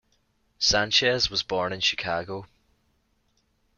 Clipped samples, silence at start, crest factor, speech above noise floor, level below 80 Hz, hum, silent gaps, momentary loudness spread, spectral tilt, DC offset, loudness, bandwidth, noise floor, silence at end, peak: under 0.1%; 0.6 s; 20 dB; 44 dB; -52 dBFS; none; none; 11 LU; -2 dB/octave; under 0.1%; -23 LUFS; 12 kHz; -70 dBFS; 1.3 s; -8 dBFS